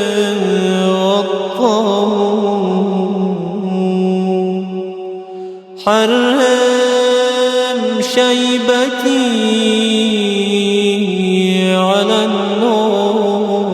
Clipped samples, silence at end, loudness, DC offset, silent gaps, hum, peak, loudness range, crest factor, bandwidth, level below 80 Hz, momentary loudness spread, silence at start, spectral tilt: under 0.1%; 0 s; -14 LUFS; under 0.1%; none; none; 0 dBFS; 4 LU; 14 dB; 14 kHz; -62 dBFS; 7 LU; 0 s; -5 dB/octave